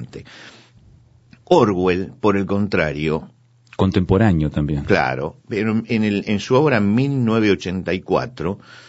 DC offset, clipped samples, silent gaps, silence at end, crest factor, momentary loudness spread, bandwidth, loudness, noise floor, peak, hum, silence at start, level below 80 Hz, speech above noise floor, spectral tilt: under 0.1%; under 0.1%; none; 0.1 s; 18 dB; 11 LU; 8 kHz; -19 LUFS; -50 dBFS; -2 dBFS; none; 0 s; -42 dBFS; 32 dB; -7.5 dB/octave